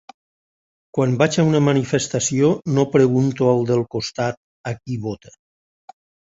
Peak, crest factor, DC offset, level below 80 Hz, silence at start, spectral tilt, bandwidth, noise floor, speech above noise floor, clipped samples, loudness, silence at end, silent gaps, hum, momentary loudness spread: -2 dBFS; 18 dB; under 0.1%; -56 dBFS; 0.95 s; -6 dB/octave; 8 kHz; under -90 dBFS; over 72 dB; under 0.1%; -19 LUFS; 1.15 s; 4.37-4.64 s; none; 13 LU